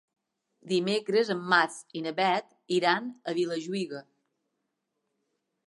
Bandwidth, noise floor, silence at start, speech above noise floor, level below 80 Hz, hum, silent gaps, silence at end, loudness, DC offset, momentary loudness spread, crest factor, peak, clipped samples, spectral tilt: 11.5 kHz; -81 dBFS; 0.65 s; 53 dB; -84 dBFS; none; none; 1.65 s; -28 LUFS; under 0.1%; 10 LU; 22 dB; -8 dBFS; under 0.1%; -4.5 dB/octave